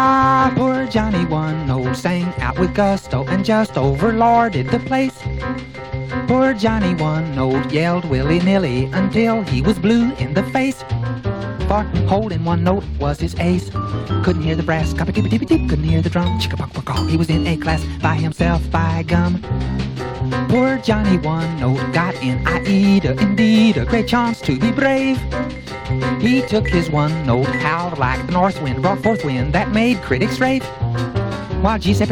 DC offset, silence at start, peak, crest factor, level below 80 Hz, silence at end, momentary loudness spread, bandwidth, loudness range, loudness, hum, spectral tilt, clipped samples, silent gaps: under 0.1%; 0 s; 0 dBFS; 16 dB; -30 dBFS; 0 s; 7 LU; 14.5 kHz; 3 LU; -18 LUFS; none; -7 dB/octave; under 0.1%; none